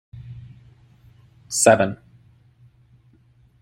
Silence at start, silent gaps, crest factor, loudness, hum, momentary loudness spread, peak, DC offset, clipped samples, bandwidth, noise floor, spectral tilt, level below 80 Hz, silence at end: 0.15 s; none; 24 dB; -18 LUFS; none; 25 LU; -2 dBFS; under 0.1%; under 0.1%; 16 kHz; -56 dBFS; -3.5 dB/octave; -58 dBFS; 1.65 s